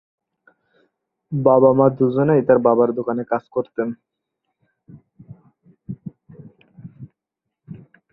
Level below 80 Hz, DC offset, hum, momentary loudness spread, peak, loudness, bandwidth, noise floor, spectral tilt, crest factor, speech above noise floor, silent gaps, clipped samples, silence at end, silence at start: -62 dBFS; under 0.1%; none; 25 LU; -2 dBFS; -18 LUFS; 4 kHz; -82 dBFS; -12.5 dB/octave; 20 dB; 65 dB; none; under 0.1%; 0.35 s; 1.3 s